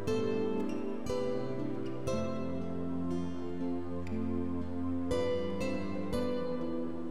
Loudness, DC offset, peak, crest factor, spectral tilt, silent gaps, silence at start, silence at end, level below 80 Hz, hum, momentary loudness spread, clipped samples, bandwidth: -36 LUFS; 1%; -20 dBFS; 14 dB; -7 dB/octave; none; 0 s; 0 s; -54 dBFS; none; 5 LU; under 0.1%; 13.5 kHz